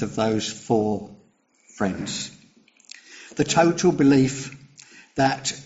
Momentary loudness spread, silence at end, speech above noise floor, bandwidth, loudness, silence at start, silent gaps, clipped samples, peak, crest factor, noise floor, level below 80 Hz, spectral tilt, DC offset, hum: 19 LU; 0 s; 38 dB; 8 kHz; -22 LUFS; 0 s; none; under 0.1%; -4 dBFS; 18 dB; -60 dBFS; -56 dBFS; -5 dB/octave; under 0.1%; none